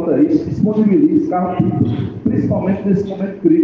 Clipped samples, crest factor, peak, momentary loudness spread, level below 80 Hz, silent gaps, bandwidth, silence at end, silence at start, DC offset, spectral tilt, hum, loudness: under 0.1%; 12 dB; -2 dBFS; 6 LU; -46 dBFS; none; 6.4 kHz; 0 s; 0 s; under 0.1%; -10.5 dB/octave; none; -16 LUFS